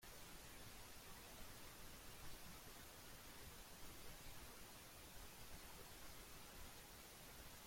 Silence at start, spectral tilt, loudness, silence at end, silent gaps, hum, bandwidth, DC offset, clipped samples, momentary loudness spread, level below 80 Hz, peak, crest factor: 0 s; -2.5 dB/octave; -58 LUFS; 0 s; none; none; 16.5 kHz; under 0.1%; under 0.1%; 1 LU; -66 dBFS; -42 dBFS; 14 dB